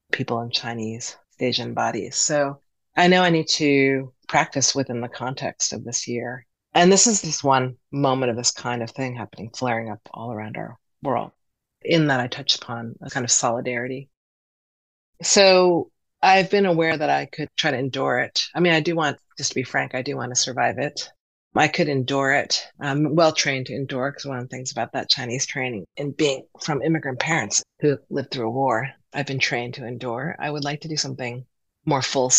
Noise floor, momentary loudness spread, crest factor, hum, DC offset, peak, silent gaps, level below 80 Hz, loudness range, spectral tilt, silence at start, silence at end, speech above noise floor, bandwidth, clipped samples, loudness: under -90 dBFS; 14 LU; 20 dB; none; under 0.1%; -2 dBFS; 14.17-15.13 s, 21.20-21.51 s; -64 dBFS; 6 LU; -3 dB/octave; 0.15 s; 0 s; over 68 dB; 9.6 kHz; under 0.1%; -22 LUFS